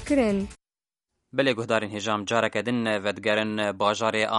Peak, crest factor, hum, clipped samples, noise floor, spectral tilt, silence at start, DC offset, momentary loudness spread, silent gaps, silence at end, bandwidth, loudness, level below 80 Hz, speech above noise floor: -6 dBFS; 20 dB; none; under 0.1%; under -90 dBFS; -4.5 dB/octave; 0 s; under 0.1%; 5 LU; none; 0 s; 11.5 kHz; -25 LUFS; -52 dBFS; over 65 dB